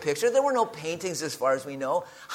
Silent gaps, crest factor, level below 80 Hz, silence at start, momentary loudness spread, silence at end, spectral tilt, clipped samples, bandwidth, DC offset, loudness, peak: none; 16 dB; -72 dBFS; 0 s; 7 LU; 0 s; -3.5 dB/octave; under 0.1%; 17 kHz; under 0.1%; -27 LUFS; -10 dBFS